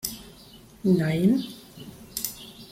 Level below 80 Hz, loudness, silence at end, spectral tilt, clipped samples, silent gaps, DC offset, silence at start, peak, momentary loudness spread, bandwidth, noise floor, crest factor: -56 dBFS; -26 LUFS; 0.05 s; -5.5 dB/octave; under 0.1%; none; under 0.1%; 0.05 s; -10 dBFS; 22 LU; 16.5 kHz; -49 dBFS; 18 dB